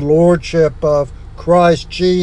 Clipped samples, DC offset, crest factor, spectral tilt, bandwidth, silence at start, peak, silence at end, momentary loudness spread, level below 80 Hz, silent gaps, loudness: under 0.1%; under 0.1%; 12 dB; -7 dB/octave; 10 kHz; 0 s; 0 dBFS; 0 s; 8 LU; -32 dBFS; none; -13 LUFS